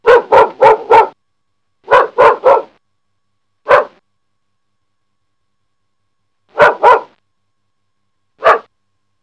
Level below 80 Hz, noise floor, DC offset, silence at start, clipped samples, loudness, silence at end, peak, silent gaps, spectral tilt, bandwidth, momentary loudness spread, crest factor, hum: -52 dBFS; -73 dBFS; under 0.1%; 0.05 s; 1%; -10 LUFS; 0.65 s; 0 dBFS; none; -4.5 dB/octave; 11 kHz; 8 LU; 14 dB; none